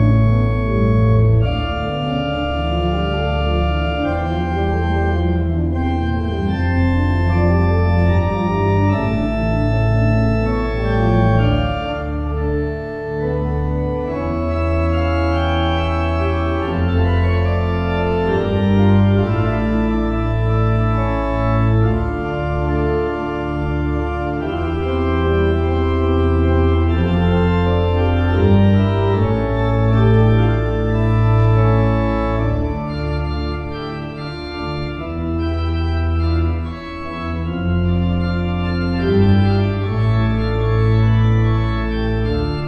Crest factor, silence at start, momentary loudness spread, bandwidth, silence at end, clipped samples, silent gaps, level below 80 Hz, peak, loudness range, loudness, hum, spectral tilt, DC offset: 14 dB; 0 s; 7 LU; 6 kHz; 0 s; under 0.1%; none; -24 dBFS; -2 dBFS; 5 LU; -18 LUFS; none; -9 dB/octave; under 0.1%